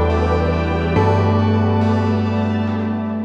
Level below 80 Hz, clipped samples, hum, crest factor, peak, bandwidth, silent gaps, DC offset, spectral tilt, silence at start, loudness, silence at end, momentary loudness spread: -30 dBFS; under 0.1%; none; 12 dB; -4 dBFS; 7 kHz; none; under 0.1%; -8.5 dB/octave; 0 s; -18 LUFS; 0 s; 5 LU